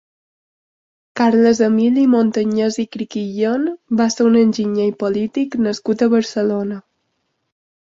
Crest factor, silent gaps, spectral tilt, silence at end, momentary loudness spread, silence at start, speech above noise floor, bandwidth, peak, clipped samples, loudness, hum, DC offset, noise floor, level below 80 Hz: 14 dB; none; -6 dB/octave; 1.15 s; 10 LU; 1.15 s; 54 dB; 7.6 kHz; -2 dBFS; under 0.1%; -17 LUFS; none; under 0.1%; -70 dBFS; -60 dBFS